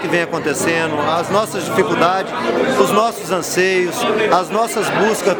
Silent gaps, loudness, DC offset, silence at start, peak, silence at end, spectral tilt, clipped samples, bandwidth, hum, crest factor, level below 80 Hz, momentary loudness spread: none; -16 LUFS; under 0.1%; 0 s; 0 dBFS; 0 s; -4 dB/octave; under 0.1%; over 20 kHz; none; 16 dB; -54 dBFS; 4 LU